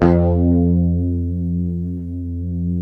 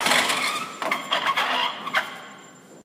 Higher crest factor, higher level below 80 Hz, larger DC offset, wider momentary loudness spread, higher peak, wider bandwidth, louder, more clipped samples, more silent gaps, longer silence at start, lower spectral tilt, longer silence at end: about the same, 18 dB vs 22 dB; first, -30 dBFS vs -72 dBFS; neither; second, 10 LU vs 14 LU; first, 0 dBFS vs -4 dBFS; second, 3.2 kHz vs 15.5 kHz; first, -19 LUFS vs -23 LUFS; neither; neither; about the same, 0 s vs 0 s; first, -11.5 dB/octave vs -0.5 dB/octave; about the same, 0 s vs 0 s